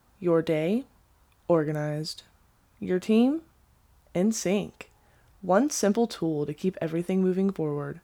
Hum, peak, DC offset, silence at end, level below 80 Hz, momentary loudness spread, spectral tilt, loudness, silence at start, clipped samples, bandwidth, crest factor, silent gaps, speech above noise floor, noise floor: none; -10 dBFS; under 0.1%; 0.05 s; -62 dBFS; 11 LU; -6 dB/octave; -27 LUFS; 0.2 s; under 0.1%; 18 kHz; 18 dB; none; 36 dB; -62 dBFS